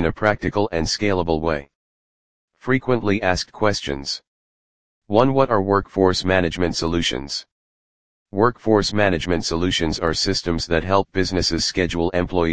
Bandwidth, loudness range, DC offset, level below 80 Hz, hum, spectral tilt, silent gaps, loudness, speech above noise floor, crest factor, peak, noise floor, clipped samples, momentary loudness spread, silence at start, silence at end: 10 kHz; 3 LU; 1%; -40 dBFS; none; -4.5 dB/octave; 1.75-2.48 s, 4.27-5.02 s, 7.52-8.26 s; -20 LUFS; over 70 dB; 20 dB; 0 dBFS; under -90 dBFS; under 0.1%; 7 LU; 0 s; 0 s